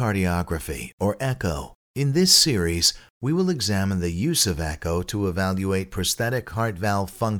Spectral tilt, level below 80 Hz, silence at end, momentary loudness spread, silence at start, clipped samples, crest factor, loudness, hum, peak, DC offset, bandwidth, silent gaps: -4 dB/octave; -42 dBFS; 0 s; 11 LU; 0 s; under 0.1%; 20 dB; -23 LUFS; none; -4 dBFS; under 0.1%; 20 kHz; 0.93-0.98 s, 1.75-1.94 s, 3.10-3.21 s